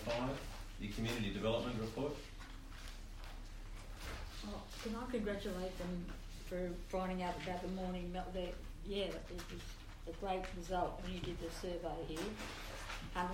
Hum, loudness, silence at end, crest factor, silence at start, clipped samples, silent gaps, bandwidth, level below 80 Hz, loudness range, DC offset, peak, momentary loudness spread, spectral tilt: none; -44 LUFS; 0 s; 18 dB; 0 s; under 0.1%; none; 16 kHz; -50 dBFS; 3 LU; under 0.1%; -26 dBFS; 13 LU; -5.5 dB/octave